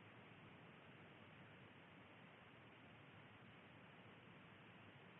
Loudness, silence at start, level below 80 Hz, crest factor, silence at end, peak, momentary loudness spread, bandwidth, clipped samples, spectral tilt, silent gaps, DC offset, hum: -63 LUFS; 0 s; under -90 dBFS; 12 dB; 0 s; -52 dBFS; 1 LU; 3.9 kHz; under 0.1%; -3 dB/octave; none; under 0.1%; none